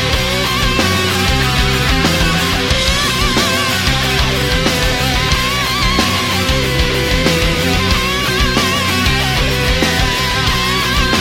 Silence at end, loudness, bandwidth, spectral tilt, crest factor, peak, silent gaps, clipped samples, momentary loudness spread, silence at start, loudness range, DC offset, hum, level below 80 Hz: 0 s; -13 LUFS; 16.5 kHz; -3.5 dB/octave; 14 dB; 0 dBFS; none; under 0.1%; 1 LU; 0 s; 1 LU; under 0.1%; none; -22 dBFS